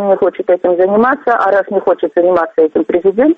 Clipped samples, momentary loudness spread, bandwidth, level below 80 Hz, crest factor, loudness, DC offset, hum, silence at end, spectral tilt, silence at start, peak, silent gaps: under 0.1%; 3 LU; 5.2 kHz; -52 dBFS; 10 dB; -12 LUFS; under 0.1%; none; 0.05 s; -8.5 dB/octave; 0 s; -2 dBFS; none